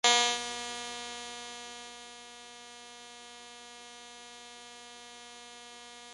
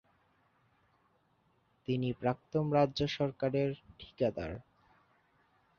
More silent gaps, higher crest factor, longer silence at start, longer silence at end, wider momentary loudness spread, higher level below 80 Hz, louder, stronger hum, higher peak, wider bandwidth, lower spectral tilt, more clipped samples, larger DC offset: neither; first, 26 dB vs 20 dB; second, 0.05 s vs 1.9 s; second, 0 s vs 1.2 s; second, 14 LU vs 17 LU; second, -72 dBFS vs -62 dBFS; about the same, -36 LUFS vs -34 LUFS; neither; first, -10 dBFS vs -16 dBFS; first, 11.5 kHz vs 7 kHz; second, 1.5 dB/octave vs -6 dB/octave; neither; neither